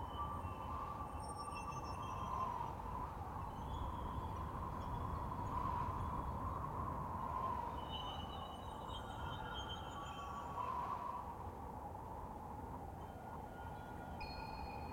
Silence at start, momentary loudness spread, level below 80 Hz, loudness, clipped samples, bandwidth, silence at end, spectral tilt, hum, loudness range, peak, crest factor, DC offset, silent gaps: 0 s; 7 LU; -54 dBFS; -46 LUFS; under 0.1%; 16.5 kHz; 0 s; -6 dB/octave; none; 5 LU; -30 dBFS; 16 dB; under 0.1%; none